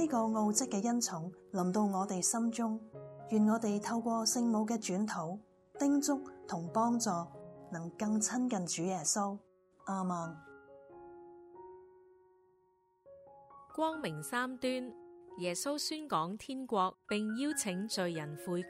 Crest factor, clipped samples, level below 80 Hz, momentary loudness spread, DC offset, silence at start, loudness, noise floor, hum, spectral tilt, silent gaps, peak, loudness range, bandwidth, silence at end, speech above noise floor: 18 dB; under 0.1%; -78 dBFS; 18 LU; under 0.1%; 0 s; -35 LUFS; -72 dBFS; none; -4 dB/octave; none; -18 dBFS; 11 LU; 16 kHz; 0 s; 38 dB